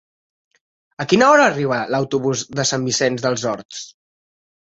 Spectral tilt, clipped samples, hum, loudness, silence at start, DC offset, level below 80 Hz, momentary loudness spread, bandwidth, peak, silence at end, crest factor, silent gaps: -4 dB/octave; under 0.1%; none; -17 LUFS; 1 s; under 0.1%; -58 dBFS; 17 LU; 8.2 kHz; -2 dBFS; 0.85 s; 18 dB; 3.65-3.69 s